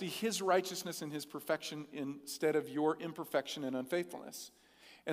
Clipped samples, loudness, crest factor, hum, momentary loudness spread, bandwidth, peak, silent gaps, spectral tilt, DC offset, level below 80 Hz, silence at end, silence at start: under 0.1%; -37 LUFS; 20 dB; none; 12 LU; 16 kHz; -18 dBFS; none; -4 dB/octave; under 0.1%; -84 dBFS; 0 s; 0 s